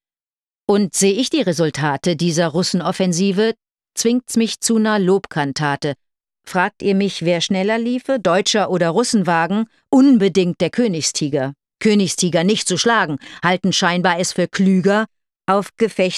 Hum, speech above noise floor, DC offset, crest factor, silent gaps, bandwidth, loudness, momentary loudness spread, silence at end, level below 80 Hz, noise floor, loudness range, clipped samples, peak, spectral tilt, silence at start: none; over 73 dB; under 0.1%; 16 dB; none; 13 kHz; -17 LUFS; 6 LU; 0 s; -60 dBFS; under -90 dBFS; 3 LU; under 0.1%; -2 dBFS; -4.5 dB/octave; 0.7 s